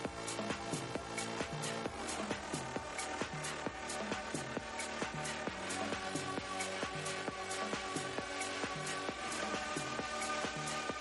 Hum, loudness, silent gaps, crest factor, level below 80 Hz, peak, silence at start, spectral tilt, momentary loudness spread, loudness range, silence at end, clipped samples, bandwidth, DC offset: none; -40 LUFS; none; 16 dB; -64 dBFS; -24 dBFS; 0 s; -3 dB/octave; 3 LU; 2 LU; 0 s; under 0.1%; 11.5 kHz; under 0.1%